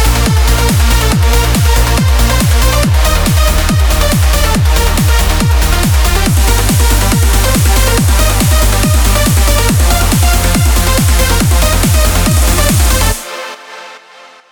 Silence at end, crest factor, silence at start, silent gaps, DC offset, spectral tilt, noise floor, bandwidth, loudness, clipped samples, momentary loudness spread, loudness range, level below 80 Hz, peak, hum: 0.55 s; 8 dB; 0 s; none; under 0.1%; -4 dB/octave; -37 dBFS; over 20 kHz; -10 LUFS; under 0.1%; 1 LU; 1 LU; -12 dBFS; 0 dBFS; none